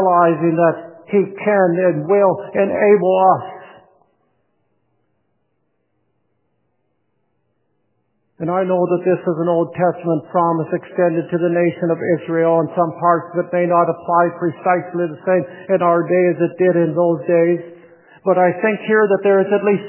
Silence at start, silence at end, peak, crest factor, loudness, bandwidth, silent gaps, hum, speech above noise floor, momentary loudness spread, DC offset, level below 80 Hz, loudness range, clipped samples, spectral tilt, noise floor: 0 s; 0 s; 0 dBFS; 16 dB; -16 LUFS; 3.2 kHz; none; none; 54 dB; 6 LU; under 0.1%; -66 dBFS; 6 LU; under 0.1%; -11.5 dB/octave; -69 dBFS